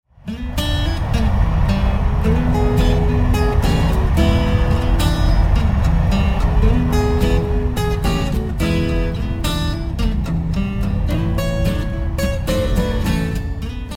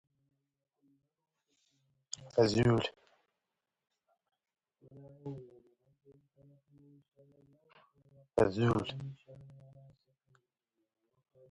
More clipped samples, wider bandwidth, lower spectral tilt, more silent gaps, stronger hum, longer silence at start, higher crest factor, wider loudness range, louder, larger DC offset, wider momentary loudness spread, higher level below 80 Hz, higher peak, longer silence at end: neither; first, 16.5 kHz vs 10 kHz; about the same, -6.5 dB/octave vs -6.5 dB/octave; neither; neither; second, 0.25 s vs 2.2 s; second, 14 dB vs 24 dB; second, 4 LU vs 20 LU; first, -19 LUFS vs -32 LUFS; neither; second, 5 LU vs 26 LU; first, -20 dBFS vs -62 dBFS; first, -2 dBFS vs -14 dBFS; second, 0 s vs 2.05 s